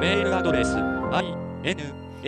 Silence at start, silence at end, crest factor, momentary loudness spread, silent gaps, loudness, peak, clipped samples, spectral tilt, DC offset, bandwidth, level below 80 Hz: 0 s; 0 s; 16 dB; 9 LU; none; -25 LUFS; -8 dBFS; under 0.1%; -5.5 dB/octave; under 0.1%; 10 kHz; -42 dBFS